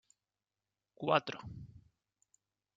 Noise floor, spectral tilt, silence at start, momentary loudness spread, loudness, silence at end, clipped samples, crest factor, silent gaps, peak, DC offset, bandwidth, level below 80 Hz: under -90 dBFS; -5.5 dB/octave; 1 s; 21 LU; -35 LUFS; 1 s; under 0.1%; 28 dB; none; -14 dBFS; under 0.1%; 7.8 kHz; -70 dBFS